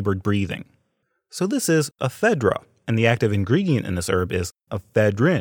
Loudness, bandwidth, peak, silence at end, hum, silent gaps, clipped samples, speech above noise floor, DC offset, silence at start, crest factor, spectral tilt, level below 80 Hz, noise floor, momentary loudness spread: -22 LUFS; 18.5 kHz; -2 dBFS; 0 s; none; none; under 0.1%; 51 dB; under 0.1%; 0 s; 20 dB; -6 dB/octave; -56 dBFS; -72 dBFS; 10 LU